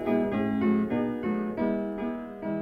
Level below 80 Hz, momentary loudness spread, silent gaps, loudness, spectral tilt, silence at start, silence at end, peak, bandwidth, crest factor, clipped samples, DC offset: -56 dBFS; 8 LU; none; -29 LUFS; -9.5 dB/octave; 0 s; 0 s; -14 dBFS; 4.9 kHz; 14 dB; under 0.1%; under 0.1%